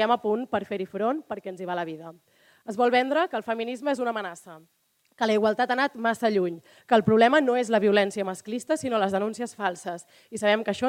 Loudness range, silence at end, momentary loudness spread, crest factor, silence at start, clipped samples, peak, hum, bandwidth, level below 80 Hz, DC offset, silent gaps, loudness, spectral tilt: 5 LU; 0 s; 15 LU; 20 dB; 0 s; under 0.1%; -6 dBFS; none; 16 kHz; -68 dBFS; under 0.1%; none; -25 LUFS; -5 dB/octave